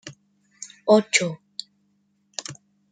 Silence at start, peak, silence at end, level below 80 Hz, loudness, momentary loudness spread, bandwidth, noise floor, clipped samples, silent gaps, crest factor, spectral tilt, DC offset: 0.05 s; -2 dBFS; 0.35 s; -74 dBFS; -22 LUFS; 24 LU; 9.6 kHz; -68 dBFS; under 0.1%; none; 24 dB; -3.5 dB/octave; under 0.1%